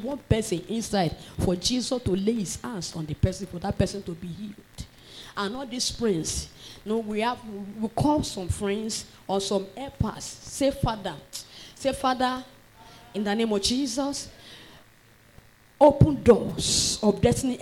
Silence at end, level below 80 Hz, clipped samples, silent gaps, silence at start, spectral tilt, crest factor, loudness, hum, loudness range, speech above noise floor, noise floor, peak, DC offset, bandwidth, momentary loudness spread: 0 s; -44 dBFS; under 0.1%; none; 0 s; -5 dB/octave; 20 dB; -26 LUFS; none; 7 LU; 30 dB; -56 dBFS; -6 dBFS; under 0.1%; 17 kHz; 17 LU